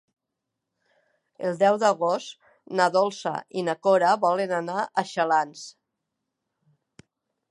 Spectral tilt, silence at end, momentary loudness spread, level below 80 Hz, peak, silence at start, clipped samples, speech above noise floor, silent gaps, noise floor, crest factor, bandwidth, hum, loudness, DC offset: -4.5 dB/octave; 1.8 s; 11 LU; -80 dBFS; -6 dBFS; 1.4 s; under 0.1%; 60 dB; none; -84 dBFS; 22 dB; 11 kHz; none; -24 LUFS; under 0.1%